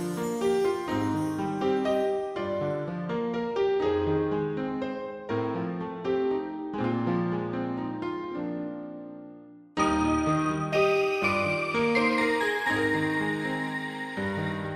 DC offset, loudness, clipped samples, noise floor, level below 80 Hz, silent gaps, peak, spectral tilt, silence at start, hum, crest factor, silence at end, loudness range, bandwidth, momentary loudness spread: under 0.1%; -28 LUFS; under 0.1%; -48 dBFS; -54 dBFS; none; -12 dBFS; -6 dB/octave; 0 s; none; 16 dB; 0 s; 5 LU; 14.5 kHz; 9 LU